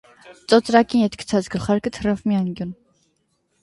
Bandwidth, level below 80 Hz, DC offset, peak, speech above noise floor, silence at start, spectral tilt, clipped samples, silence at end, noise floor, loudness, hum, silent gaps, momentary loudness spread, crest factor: 11.5 kHz; -50 dBFS; under 0.1%; 0 dBFS; 49 dB; 0.25 s; -6 dB/octave; under 0.1%; 0.9 s; -68 dBFS; -20 LUFS; none; none; 13 LU; 20 dB